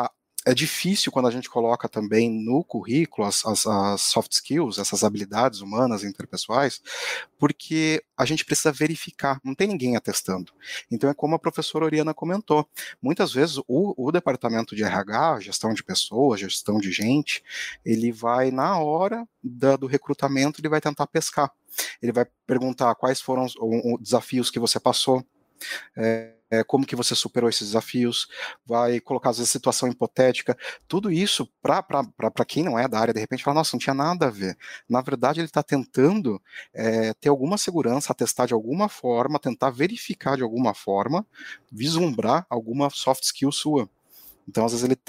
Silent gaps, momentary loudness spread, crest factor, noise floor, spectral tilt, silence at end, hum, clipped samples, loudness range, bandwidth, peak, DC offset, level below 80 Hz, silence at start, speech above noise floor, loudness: none; 7 LU; 20 dB; -51 dBFS; -4 dB/octave; 0.15 s; none; under 0.1%; 2 LU; 16 kHz; -4 dBFS; under 0.1%; -66 dBFS; 0 s; 28 dB; -24 LUFS